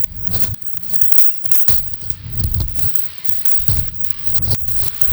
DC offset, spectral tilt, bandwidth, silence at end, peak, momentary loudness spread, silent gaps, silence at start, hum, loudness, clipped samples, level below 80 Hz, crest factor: under 0.1%; -4 dB/octave; over 20 kHz; 0 s; -2 dBFS; 10 LU; none; 0 s; none; -12 LUFS; under 0.1%; -30 dBFS; 14 dB